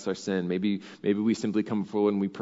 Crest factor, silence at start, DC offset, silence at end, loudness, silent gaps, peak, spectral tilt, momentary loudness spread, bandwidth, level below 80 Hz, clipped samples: 16 dB; 0 s; under 0.1%; 0 s; -28 LUFS; none; -12 dBFS; -6.5 dB/octave; 4 LU; 7.8 kHz; -76 dBFS; under 0.1%